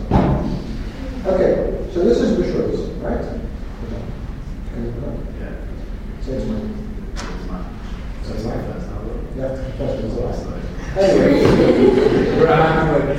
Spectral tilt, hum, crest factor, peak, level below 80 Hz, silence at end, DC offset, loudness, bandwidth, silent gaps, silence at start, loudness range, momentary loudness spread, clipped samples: -7.5 dB/octave; none; 18 dB; 0 dBFS; -28 dBFS; 0 s; under 0.1%; -19 LUFS; 15 kHz; none; 0 s; 13 LU; 18 LU; under 0.1%